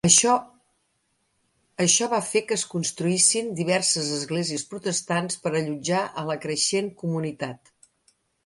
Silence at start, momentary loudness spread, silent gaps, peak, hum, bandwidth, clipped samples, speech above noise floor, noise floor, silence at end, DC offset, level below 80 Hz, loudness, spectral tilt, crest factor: 0.05 s; 10 LU; none; -4 dBFS; none; 11.5 kHz; under 0.1%; 47 dB; -72 dBFS; 0.9 s; under 0.1%; -64 dBFS; -23 LUFS; -3 dB/octave; 22 dB